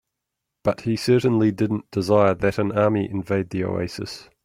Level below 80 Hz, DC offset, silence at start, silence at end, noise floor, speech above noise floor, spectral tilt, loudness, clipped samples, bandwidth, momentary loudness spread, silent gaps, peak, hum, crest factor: -54 dBFS; under 0.1%; 0.65 s; 0.2 s; -82 dBFS; 61 dB; -7 dB/octave; -22 LUFS; under 0.1%; 16 kHz; 9 LU; none; -4 dBFS; none; 18 dB